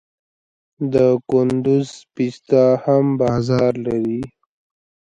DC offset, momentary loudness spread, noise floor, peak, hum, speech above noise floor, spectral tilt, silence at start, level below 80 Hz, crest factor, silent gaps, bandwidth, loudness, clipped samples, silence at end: under 0.1%; 10 LU; under -90 dBFS; -2 dBFS; none; over 73 dB; -8 dB/octave; 0.8 s; -52 dBFS; 16 dB; none; 9.2 kHz; -18 LUFS; under 0.1%; 0.75 s